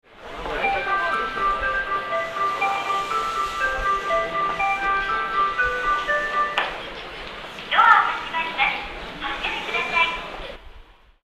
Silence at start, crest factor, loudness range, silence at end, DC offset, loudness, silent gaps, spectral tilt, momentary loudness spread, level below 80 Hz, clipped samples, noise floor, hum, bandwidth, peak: 0.1 s; 22 dB; 2 LU; 0.3 s; under 0.1%; -22 LUFS; none; -2.5 dB/octave; 13 LU; -44 dBFS; under 0.1%; -47 dBFS; none; 14 kHz; -2 dBFS